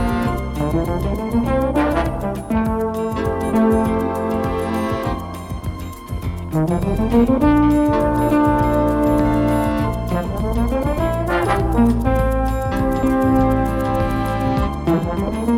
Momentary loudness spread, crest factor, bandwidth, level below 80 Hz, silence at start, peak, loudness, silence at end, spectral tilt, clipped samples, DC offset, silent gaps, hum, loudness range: 7 LU; 14 dB; 16.5 kHz; -26 dBFS; 0 s; -4 dBFS; -19 LUFS; 0 s; -8 dB/octave; under 0.1%; under 0.1%; none; none; 4 LU